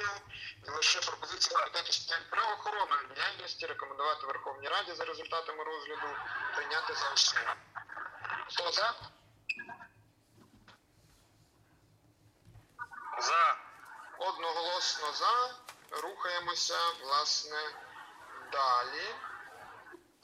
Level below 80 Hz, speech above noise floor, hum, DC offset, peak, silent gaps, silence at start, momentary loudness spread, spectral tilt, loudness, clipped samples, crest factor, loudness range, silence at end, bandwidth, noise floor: -74 dBFS; 32 dB; none; under 0.1%; -12 dBFS; none; 0 s; 20 LU; 0.5 dB/octave; -33 LUFS; under 0.1%; 24 dB; 6 LU; 0.25 s; 15.5 kHz; -66 dBFS